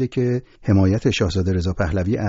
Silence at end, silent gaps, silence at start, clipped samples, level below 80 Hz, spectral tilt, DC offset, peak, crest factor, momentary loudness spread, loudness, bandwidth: 0 s; none; 0 s; under 0.1%; -36 dBFS; -7 dB/octave; under 0.1%; -4 dBFS; 14 dB; 5 LU; -20 LUFS; 7.8 kHz